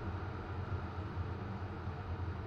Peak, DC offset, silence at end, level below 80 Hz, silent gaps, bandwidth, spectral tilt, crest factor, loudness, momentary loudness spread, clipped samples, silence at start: -28 dBFS; under 0.1%; 0 s; -50 dBFS; none; 6.4 kHz; -8.5 dB/octave; 12 dB; -42 LUFS; 2 LU; under 0.1%; 0 s